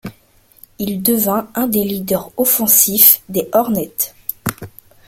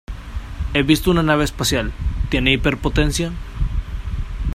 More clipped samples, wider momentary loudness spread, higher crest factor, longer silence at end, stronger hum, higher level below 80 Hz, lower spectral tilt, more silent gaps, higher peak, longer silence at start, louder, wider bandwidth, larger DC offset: first, 0.1% vs under 0.1%; about the same, 15 LU vs 13 LU; about the same, 16 dB vs 18 dB; first, 0.4 s vs 0 s; neither; second, -52 dBFS vs -26 dBFS; second, -3.5 dB/octave vs -5 dB/octave; neither; about the same, 0 dBFS vs 0 dBFS; about the same, 0.05 s vs 0.1 s; first, -14 LUFS vs -20 LUFS; first, over 20 kHz vs 15.5 kHz; neither